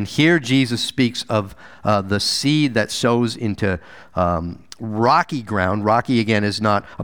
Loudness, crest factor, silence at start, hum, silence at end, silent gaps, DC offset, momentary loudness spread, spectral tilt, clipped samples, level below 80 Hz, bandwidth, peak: -19 LUFS; 18 dB; 0 s; none; 0 s; none; 0.4%; 9 LU; -5 dB/octave; under 0.1%; -48 dBFS; over 20 kHz; -2 dBFS